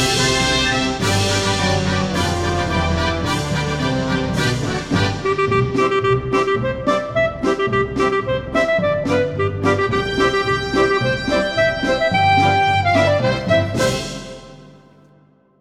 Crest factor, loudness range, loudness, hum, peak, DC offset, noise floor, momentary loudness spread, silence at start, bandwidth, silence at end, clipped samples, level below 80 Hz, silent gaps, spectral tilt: 14 dB; 3 LU; -18 LUFS; none; -4 dBFS; under 0.1%; -53 dBFS; 5 LU; 0 s; 15.5 kHz; 0.85 s; under 0.1%; -36 dBFS; none; -4.5 dB/octave